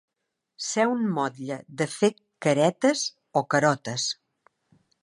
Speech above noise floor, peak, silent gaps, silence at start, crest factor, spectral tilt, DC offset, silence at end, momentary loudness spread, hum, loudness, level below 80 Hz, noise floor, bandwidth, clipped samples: 58 dB; -8 dBFS; none; 0.6 s; 20 dB; -4 dB/octave; under 0.1%; 0.9 s; 9 LU; none; -26 LUFS; -76 dBFS; -82 dBFS; 11.5 kHz; under 0.1%